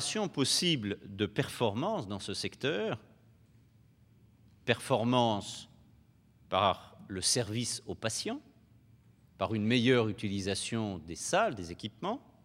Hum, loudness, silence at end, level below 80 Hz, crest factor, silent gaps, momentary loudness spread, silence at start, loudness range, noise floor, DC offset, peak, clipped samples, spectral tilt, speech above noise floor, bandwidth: none; -32 LUFS; 0.25 s; -68 dBFS; 24 dB; none; 11 LU; 0 s; 4 LU; -63 dBFS; under 0.1%; -10 dBFS; under 0.1%; -4 dB/octave; 31 dB; 16.5 kHz